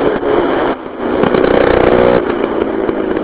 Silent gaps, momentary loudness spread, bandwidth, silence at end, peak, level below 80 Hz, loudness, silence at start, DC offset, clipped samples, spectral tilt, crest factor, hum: none; 7 LU; 4 kHz; 0 s; 0 dBFS; -32 dBFS; -13 LUFS; 0 s; under 0.1%; 0.1%; -10.5 dB/octave; 12 dB; none